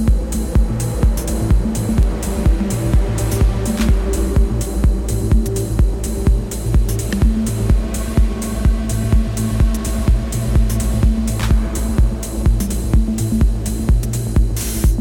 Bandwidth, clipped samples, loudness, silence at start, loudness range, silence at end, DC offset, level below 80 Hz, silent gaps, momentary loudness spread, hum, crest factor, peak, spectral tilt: 17 kHz; under 0.1%; -18 LUFS; 0 s; 1 LU; 0 s; under 0.1%; -18 dBFS; none; 3 LU; none; 12 dB; -2 dBFS; -6.5 dB/octave